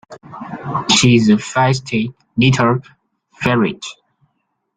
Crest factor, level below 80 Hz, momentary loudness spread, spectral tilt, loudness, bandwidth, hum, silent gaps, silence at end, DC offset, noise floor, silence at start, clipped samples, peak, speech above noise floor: 16 dB; -50 dBFS; 19 LU; -5 dB/octave; -15 LUFS; 9.6 kHz; none; none; 0.85 s; under 0.1%; -69 dBFS; 0.1 s; under 0.1%; 0 dBFS; 55 dB